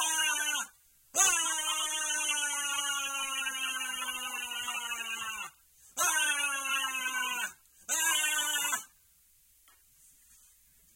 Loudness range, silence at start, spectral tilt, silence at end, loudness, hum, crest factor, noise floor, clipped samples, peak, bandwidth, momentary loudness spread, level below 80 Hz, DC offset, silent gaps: 4 LU; 0 s; 3 dB/octave; 2.1 s; -30 LUFS; none; 24 dB; -65 dBFS; under 0.1%; -10 dBFS; 16.5 kHz; 9 LU; -74 dBFS; under 0.1%; none